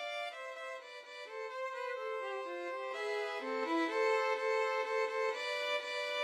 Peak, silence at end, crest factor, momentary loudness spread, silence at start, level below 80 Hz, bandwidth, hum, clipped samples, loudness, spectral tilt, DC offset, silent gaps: -22 dBFS; 0 s; 14 dB; 12 LU; 0 s; under -90 dBFS; 13.5 kHz; none; under 0.1%; -37 LUFS; -0.5 dB/octave; under 0.1%; none